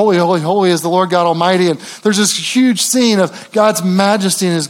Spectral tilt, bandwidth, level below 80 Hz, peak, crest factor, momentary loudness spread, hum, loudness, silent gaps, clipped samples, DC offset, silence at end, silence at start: -4 dB/octave; 17 kHz; -68 dBFS; 0 dBFS; 12 dB; 3 LU; none; -13 LUFS; none; under 0.1%; under 0.1%; 0 s; 0 s